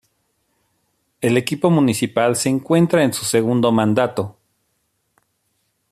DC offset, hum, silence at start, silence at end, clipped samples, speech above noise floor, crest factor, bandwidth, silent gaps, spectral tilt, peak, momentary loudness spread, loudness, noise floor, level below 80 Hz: under 0.1%; none; 1.2 s; 1.6 s; under 0.1%; 52 dB; 16 dB; 14.5 kHz; none; -5.5 dB/octave; -2 dBFS; 6 LU; -18 LUFS; -69 dBFS; -60 dBFS